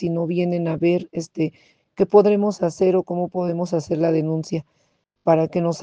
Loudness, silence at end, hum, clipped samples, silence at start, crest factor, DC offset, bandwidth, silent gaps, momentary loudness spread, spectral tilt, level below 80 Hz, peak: -21 LUFS; 0 s; none; under 0.1%; 0 s; 18 dB; under 0.1%; 9 kHz; none; 10 LU; -7.5 dB/octave; -62 dBFS; -2 dBFS